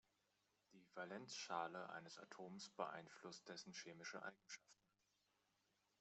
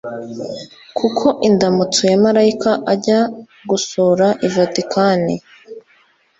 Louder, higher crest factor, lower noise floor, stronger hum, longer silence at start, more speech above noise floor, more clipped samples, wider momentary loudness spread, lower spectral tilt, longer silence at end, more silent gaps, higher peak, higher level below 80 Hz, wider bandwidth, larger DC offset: second, -54 LUFS vs -15 LUFS; first, 26 dB vs 14 dB; first, -86 dBFS vs -55 dBFS; neither; first, 0.7 s vs 0.05 s; second, 32 dB vs 39 dB; neither; second, 11 LU vs 14 LU; second, -3 dB/octave vs -5 dB/octave; first, 1.3 s vs 0.6 s; neither; second, -30 dBFS vs -2 dBFS; second, under -90 dBFS vs -56 dBFS; about the same, 8.2 kHz vs 8.2 kHz; neither